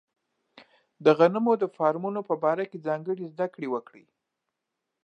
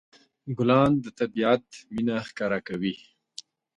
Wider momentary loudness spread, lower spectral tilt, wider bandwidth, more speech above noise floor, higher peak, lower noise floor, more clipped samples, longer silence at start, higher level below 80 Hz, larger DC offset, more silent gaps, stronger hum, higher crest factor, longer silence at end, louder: second, 12 LU vs 23 LU; about the same, -8 dB/octave vs -7 dB/octave; second, 6.8 kHz vs 10.5 kHz; first, 58 dB vs 23 dB; about the same, -6 dBFS vs -8 dBFS; first, -84 dBFS vs -48 dBFS; neither; first, 1 s vs 0.45 s; second, -84 dBFS vs -58 dBFS; neither; neither; neither; about the same, 22 dB vs 20 dB; first, 1.25 s vs 0.8 s; about the same, -26 LUFS vs -26 LUFS